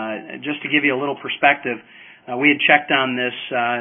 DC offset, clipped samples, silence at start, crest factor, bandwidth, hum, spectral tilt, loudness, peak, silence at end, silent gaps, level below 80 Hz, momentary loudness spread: under 0.1%; under 0.1%; 0 s; 20 dB; 3.8 kHz; none; -9 dB/octave; -18 LUFS; 0 dBFS; 0 s; none; -70 dBFS; 14 LU